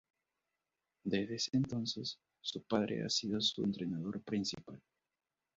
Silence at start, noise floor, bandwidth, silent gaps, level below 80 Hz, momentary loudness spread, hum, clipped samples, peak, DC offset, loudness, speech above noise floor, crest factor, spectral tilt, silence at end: 1.05 s; under -90 dBFS; 7.6 kHz; none; -70 dBFS; 10 LU; none; under 0.1%; -18 dBFS; under 0.1%; -37 LUFS; over 52 dB; 20 dB; -4.5 dB/octave; 0.8 s